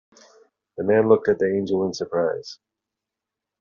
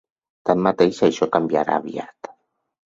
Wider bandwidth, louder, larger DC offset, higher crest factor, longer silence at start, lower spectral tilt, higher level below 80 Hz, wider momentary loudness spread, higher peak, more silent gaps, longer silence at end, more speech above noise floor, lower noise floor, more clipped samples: about the same, 7.2 kHz vs 7.8 kHz; about the same, -21 LUFS vs -20 LUFS; neither; about the same, 20 dB vs 20 dB; first, 0.75 s vs 0.45 s; about the same, -5.5 dB/octave vs -6 dB/octave; second, -66 dBFS vs -60 dBFS; second, 16 LU vs 19 LU; about the same, -4 dBFS vs -2 dBFS; neither; first, 1.05 s vs 0.6 s; first, 65 dB vs 37 dB; first, -86 dBFS vs -56 dBFS; neither